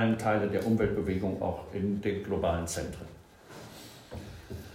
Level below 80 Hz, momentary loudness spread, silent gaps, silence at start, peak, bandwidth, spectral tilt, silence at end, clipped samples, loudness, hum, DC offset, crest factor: -52 dBFS; 19 LU; none; 0 s; -14 dBFS; 16 kHz; -6 dB/octave; 0 s; under 0.1%; -31 LUFS; none; under 0.1%; 16 dB